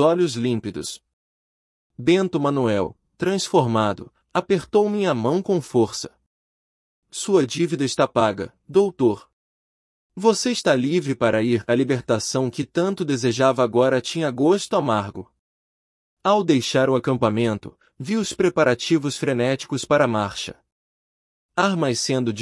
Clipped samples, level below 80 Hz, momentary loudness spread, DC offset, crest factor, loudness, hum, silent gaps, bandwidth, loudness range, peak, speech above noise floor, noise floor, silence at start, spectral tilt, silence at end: under 0.1%; -60 dBFS; 9 LU; under 0.1%; 18 dB; -21 LUFS; none; 1.13-1.90 s, 6.26-7.02 s, 9.33-10.10 s, 15.39-16.17 s, 20.72-21.49 s; 12 kHz; 2 LU; -4 dBFS; over 70 dB; under -90 dBFS; 0 s; -5 dB/octave; 0 s